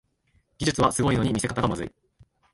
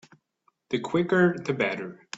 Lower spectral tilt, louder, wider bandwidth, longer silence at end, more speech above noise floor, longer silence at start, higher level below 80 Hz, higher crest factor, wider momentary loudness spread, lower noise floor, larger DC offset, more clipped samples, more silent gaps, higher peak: second, -5 dB/octave vs -6.5 dB/octave; about the same, -25 LUFS vs -26 LUFS; first, 11.5 kHz vs 7.8 kHz; first, 0.65 s vs 0 s; about the same, 43 dB vs 45 dB; about the same, 0.6 s vs 0.7 s; first, -46 dBFS vs -66 dBFS; about the same, 18 dB vs 18 dB; about the same, 9 LU vs 10 LU; second, -67 dBFS vs -71 dBFS; neither; neither; neither; about the same, -8 dBFS vs -10 dBFS